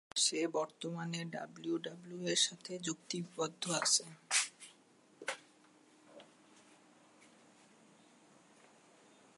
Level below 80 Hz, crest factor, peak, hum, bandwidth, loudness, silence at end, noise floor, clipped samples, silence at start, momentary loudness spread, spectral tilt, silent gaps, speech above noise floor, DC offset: under -90 dBFS; 24 dB; -18 dBFS; none; 11.5 kHz; -36 LUFS; 2.1 s; -66 dBFS; under 0.1%; 0.15 s; 13 LU; -2 dB/octave; none; 29 dB; under 0.1%